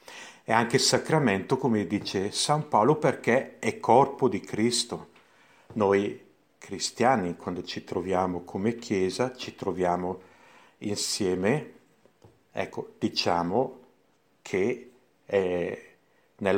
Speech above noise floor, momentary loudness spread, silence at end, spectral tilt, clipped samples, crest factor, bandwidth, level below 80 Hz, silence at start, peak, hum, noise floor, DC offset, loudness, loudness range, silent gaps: 41 dB; 13 LU; 0 s; -4.5 dB/octave; under 0.1%; 22 dB; 16.5 kHz; -66 dBFS; 0.1 s; -4 dBFS; none; -67 dBFS; under 0.1%; -27 LUFS; 6 LU; none